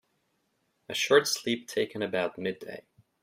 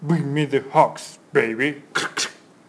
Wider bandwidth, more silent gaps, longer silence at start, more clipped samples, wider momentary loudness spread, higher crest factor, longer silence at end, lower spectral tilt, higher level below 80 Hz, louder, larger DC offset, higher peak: first, 16 kHz vs 11 kHz; neither; first, 0.9 s vs 0 s; neither; first, 17 LU vs 7 LU; about the same, 24 dB vs 20 dB; about the same, 0.4 s vs 0.35 s; second, -3 dB/octave vs -5 dB/octave; about the same, -76 dBFS vs -72 dBFS; second, -28 LUFS vs -22 LUFS; neither; second, -8 dBFS vs -2 dBFS